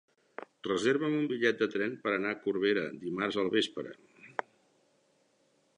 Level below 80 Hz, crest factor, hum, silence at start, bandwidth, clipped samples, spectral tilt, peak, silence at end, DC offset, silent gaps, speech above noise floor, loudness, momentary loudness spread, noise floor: -76 dBFS; 22 dB; none; 0.4 s; 10.5 kHz; under 0.1%; -5 dB/octave; -12 dBFS; 1.45 s; under 0.1%; none; 40 dB; -32 LUFS; 14 LU; -71 dBFS